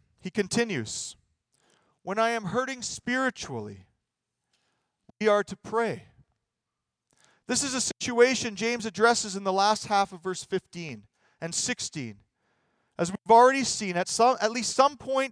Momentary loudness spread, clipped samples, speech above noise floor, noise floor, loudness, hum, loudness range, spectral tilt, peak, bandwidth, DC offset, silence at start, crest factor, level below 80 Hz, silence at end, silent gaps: 16 LU; under 0.1%; 60 dB; -86 dBFS; -26 LUFS; none; 7 LU; -3 dB/octave; -6 dBFS; 10.5 kHz; under 0.1%; 0.25 s; 22 dB; -66 dBFS; 0 s; none